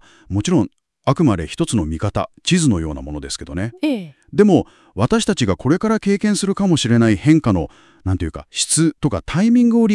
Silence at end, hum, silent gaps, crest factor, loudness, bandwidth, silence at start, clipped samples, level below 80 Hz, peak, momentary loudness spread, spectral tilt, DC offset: 0 s; none; none; 18 dB; -18 LUFS; 12 kHz; 0.3 s; under 0.1%; -40 dBFS; 0 dBFS; 12 LU; -5.5 dB/octave; under 0.1%